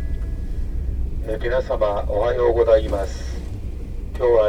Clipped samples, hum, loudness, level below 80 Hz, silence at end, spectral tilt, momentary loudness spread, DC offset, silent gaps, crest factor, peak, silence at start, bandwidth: under 0.1%; none; -22 LUFS; -26 dBFS; 0 s; -7 dB/octave; 15 LU; under 0.1%; none; 18 dB; -4 dBFS; 0 s; 10.5 kHz